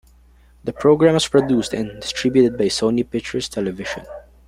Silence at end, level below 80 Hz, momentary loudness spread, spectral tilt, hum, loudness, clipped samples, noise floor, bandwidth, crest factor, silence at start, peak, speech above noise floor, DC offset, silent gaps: 0.25 s; -48 dBFS; 15 LU; -5 dB/octave; none; -19 LUFS; under 0.1%; -50 dBFS; 15 kHz; 18 dB; 0.65 s; -2 dBFS; 32 dB; under 0.1%; none